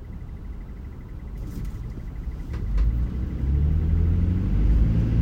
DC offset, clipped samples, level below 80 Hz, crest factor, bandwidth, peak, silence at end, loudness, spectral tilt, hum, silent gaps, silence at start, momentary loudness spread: under 0.1%; under 0.1%; -26 dBFS; 14 dB; 5.2 kHz; -10 dBFS; 0 s; -26 LUFS; -9.5 dB/octave; none; none; 0 s; 16 LU